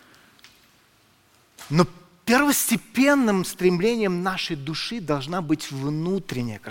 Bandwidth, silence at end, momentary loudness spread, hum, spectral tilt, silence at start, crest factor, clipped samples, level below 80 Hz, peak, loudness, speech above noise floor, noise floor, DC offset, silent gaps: 17 kHz; 0 s; 9 LU; none; -4.5 dB/octave; 1.6 s; 22 dB; under 0.1%; -54 dBFS; -2 dBFS; -23 LUFS; 37 dB; -59 dBFS; under 0.1%; none